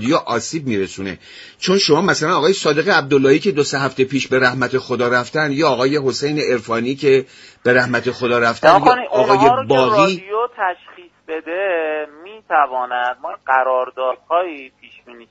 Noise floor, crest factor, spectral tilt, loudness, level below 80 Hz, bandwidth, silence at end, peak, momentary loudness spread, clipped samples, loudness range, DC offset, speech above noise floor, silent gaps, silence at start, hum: -42 dBFS; 16 dB; -4.5 dB/octave; -16 LUFS; -56 dBFS; 8 kHz; 0.1 s; 0 dBFS; 11 LU; under 0.1%; 6 LU; under 0.1%; 26 dB; none; 0 s; none